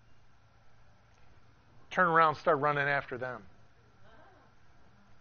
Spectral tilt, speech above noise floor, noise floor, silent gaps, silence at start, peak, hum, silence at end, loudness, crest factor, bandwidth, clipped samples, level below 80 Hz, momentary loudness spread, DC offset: -3.5 dB/octave; 30 dB; -58 dBFS; none; 0.1 s; -10 dBFS; none; 0.05 s; -29 LUFS; 24 dB; 6.6 kHz; under 0.1%; -66 dBFS; 15 LU; under 0.1%